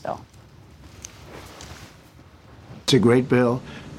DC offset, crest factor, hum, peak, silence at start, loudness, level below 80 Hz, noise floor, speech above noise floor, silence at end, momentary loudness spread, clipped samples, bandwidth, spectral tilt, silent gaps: under 0.1%; 20 dB; none; -4 dBFS; 0.05 s; -20 LUFS; -54 dBFS; -48 dBFS; 29 dB; 0 s; 24 LU; under 0.1%; 15 kHz; -5.5 dB/octave; none